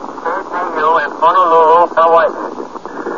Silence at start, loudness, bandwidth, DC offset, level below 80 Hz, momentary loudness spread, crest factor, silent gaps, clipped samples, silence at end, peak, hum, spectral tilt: 0 s; -11 LUFS; 7.4 kHz; 0.9%; -56 dBFS; 16 LU; 12 dB; none; under 0.1%; 0 s; 0 dBFS; none; -4.5 dB/octave